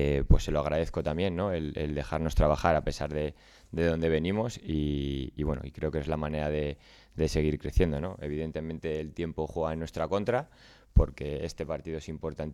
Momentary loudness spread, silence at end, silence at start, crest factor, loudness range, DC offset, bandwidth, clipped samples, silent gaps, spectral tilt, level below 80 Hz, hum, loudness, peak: 9 LU; 0 s; 0 s; 20 dB; 3 LU; under 0.1%; 13 kHz; under 0.1%; none; -7 dB/octave; -36 dBFS; none; -31 LUFS; -8 dBFS